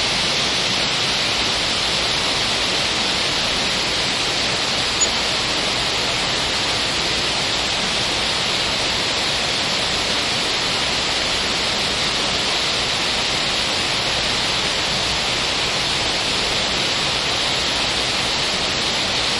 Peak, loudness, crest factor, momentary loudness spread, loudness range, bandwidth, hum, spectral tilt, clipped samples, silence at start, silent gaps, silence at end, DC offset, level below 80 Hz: -6 dBFS; -18 LUFS; 14 dB; 1 LU; 1 LU; 11.5 kHz; none; -1.5 dB/octave; under 0.1%; 0 s; none; 0 s; under 0.1%; -40 dBFS